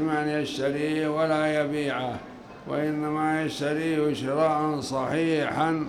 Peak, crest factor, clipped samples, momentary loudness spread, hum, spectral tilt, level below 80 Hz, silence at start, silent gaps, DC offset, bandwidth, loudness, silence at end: -10 dBFS; 16 dB; under 0.1%; 6 LU; none; -6 dB/octave; -60 dBFS; 0 s; none; under 0.1%; 13 kHz; -26 LUFS; 0 s